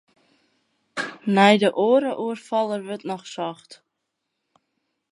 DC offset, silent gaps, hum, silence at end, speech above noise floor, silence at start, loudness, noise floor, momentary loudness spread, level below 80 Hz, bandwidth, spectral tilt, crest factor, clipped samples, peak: under 0.1%; none; none; 1.4 s; 58 dB; 0.95 s; -22 LUFS; -79 dBFS; 16 LU; -78 dBFS; 11 kHz; -5.5 dB/octave; 24 dB; under 0.1%; 0 dBFS